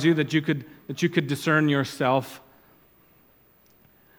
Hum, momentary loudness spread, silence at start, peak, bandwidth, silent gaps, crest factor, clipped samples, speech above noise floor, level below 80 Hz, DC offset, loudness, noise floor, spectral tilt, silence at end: none; 14 LU; 0 s; -6 dBFS; 19 kHz; none; 20 dB; under 0.1%; 35 dB; -70 dBFS; under 0.1%; -24 LUFS; -59 dBFS; -6 dB/octave; 1.8 s